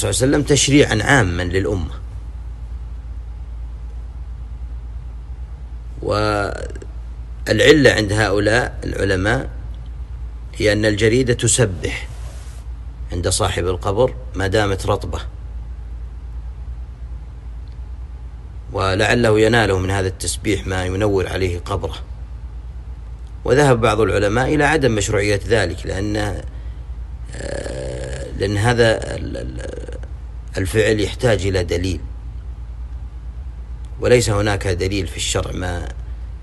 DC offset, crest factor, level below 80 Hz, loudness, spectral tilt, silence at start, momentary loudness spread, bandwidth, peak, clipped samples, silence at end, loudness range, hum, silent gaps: under 0.1%; 20 dB; -30 dBFS; -18 LUFS; -4.5 dB/octave; 0 s; 19 LU; 12.5 kHz; 0 dBFS; under 0.1%; 0 s; 10 LU; none; none